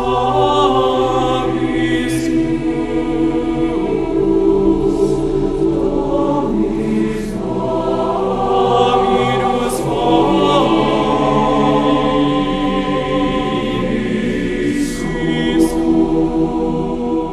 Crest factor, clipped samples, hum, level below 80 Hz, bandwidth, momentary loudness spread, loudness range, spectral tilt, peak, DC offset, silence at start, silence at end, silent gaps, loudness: 14 dB; under 0.1%; none; -30 dBFS; 13 kHz; 5 LU; 3 LU; -6.5 dB/octave; 0 dBFS; under 0.1%; 0 s; 0 s; none; -16 LUFS